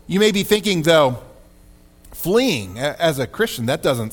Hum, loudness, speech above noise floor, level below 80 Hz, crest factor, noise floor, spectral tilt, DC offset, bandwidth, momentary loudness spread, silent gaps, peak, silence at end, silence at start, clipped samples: none; -18 LUFS; 30 dB; -46 dBFS; 16 dB; -48 dBFS; -4.5 dB/octave; under 0.1%; 19 kHz; 10 LU; none; -2 dBFS; 0 s; 0.1 s; under 0.1%